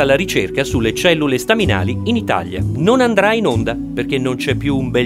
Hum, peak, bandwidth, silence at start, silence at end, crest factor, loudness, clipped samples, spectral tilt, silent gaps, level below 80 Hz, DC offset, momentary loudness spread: none; 0 dBFS; 16 kHz; 0 s; 0 s; 16 dB; -16 LUFS; under 0.1%; -5.5 dB/octave; none; -36 dBFS; under 0.1%; 6 LU